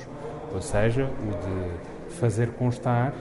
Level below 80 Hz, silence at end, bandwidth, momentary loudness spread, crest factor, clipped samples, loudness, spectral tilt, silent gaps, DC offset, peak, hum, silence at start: -42 dBFS; 0 s; 11.5 kHz; 12 LU; 16 dB; under 0.1%; -28 LUFS; -7 dB/octave; none; under 0.1%; -10 dBFS; none; 0 s